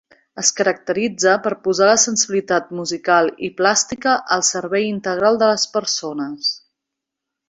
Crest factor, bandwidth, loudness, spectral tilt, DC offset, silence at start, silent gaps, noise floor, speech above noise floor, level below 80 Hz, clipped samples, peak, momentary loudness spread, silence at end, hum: 18 dB; 8.2 kHz; -18 LUFS; -2 dB/octave; under 0.1%; 0.35 s; none; -82 dBFS; 64 dB; -62 dBFS; under 0.1%; -2 dBFS; 8 LU; 0.9 s; none